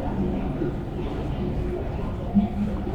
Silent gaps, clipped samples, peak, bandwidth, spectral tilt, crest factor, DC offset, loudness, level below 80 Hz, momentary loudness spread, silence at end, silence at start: none; under 0.1%; -8 dBFS; 7.8 kHz; -9.5 dB/octave; 18 dB; under 0.1%; -28 LUFS; -32 dBFS; 6 LU; 0 s; 0 s